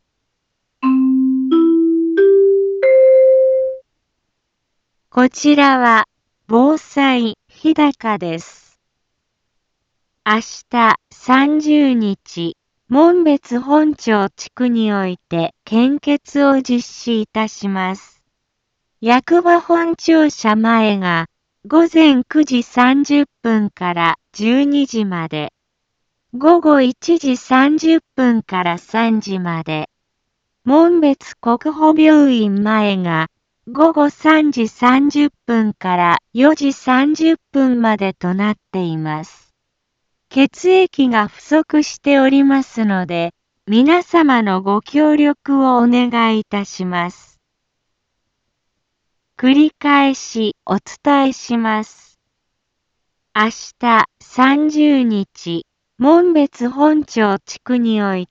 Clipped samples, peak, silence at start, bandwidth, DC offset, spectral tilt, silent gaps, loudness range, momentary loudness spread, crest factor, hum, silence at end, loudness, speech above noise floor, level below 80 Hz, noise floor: under 0.1%; 0 dBFS; 0.8 s; 7.6 kHz; under 0.1%; -5.5 dB/octave; none; 5 LU; 10 LU; 14 dB; none; 0.05 s; -14 LUFS; 60 dB; -60 dBFS; -73 dBFS